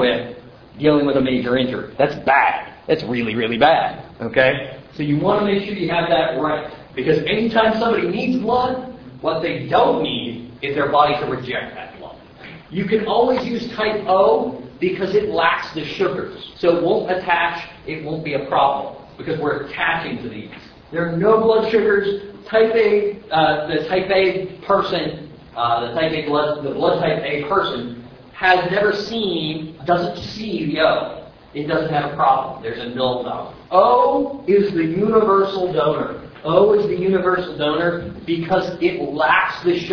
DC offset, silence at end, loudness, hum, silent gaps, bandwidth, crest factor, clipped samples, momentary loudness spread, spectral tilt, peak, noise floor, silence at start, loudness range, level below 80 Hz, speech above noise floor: under 0.1%; 0 s; -19 LUFS; none; none; 5.4 kHz; 18 dB; under 0.1%; 13 LU; -7 dB/octave; 0 dBFS; -39 dBFS; 0 s; 3 LU; -50 dBFS; 21 dB